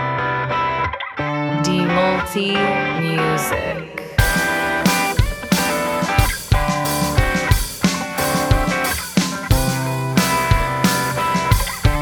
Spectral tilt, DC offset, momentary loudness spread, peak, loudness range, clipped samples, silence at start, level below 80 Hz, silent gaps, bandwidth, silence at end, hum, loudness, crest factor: -4.5 dB/octave; under 0.1%; 4 LU; 0 dBFS; 1 LU; under 0.1%; 0 s; -26 dBFS; none; over 20 kHz; 0 s; none; -18 LUFS; 18 dB